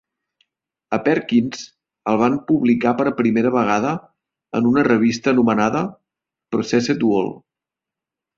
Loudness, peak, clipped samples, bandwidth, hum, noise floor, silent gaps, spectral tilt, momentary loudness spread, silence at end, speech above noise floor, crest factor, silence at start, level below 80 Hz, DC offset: -19 LUFS; -2 dBFS; under 0.1%; 7.4 kHz; none; -87 dBFS; none; -6 dB/octave; 11 LU; 1 s; 69 dB; 16 dB; 0.9 s; -58 dBFS; under 0.1%